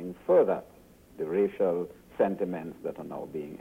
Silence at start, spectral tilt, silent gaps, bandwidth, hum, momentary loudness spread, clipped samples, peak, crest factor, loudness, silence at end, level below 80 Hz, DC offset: 0 s; -8.5 dB/octave; none; 16 kHz; none; 14 LU; under 0.1%; -12 dBFS; 16 dB; -29 LUFS; 0 s; -64 dBFS; under 0.1%